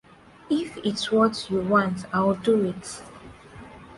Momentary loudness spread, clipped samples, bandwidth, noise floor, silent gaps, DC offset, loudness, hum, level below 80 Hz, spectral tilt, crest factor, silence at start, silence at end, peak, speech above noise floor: 23 LU; under 0.1%; 11.5 kHz; -45 dBFS; none; under 0.1%; -24 LUFS; none; -56 dBFS; -5.5 dB/octave; 18 dB; 0.5 s; 0 s; -8 dBFS; 21 dB